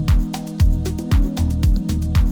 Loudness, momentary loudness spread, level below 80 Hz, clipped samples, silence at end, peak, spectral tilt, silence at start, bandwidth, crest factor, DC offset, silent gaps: -20 LUFS; 3 LU; -20 dBFS; under 0.1%; 0 s; -6 dBFS; -7 dB/octave; 0 s; 20 kHz; 10 dB; under 0.1%; none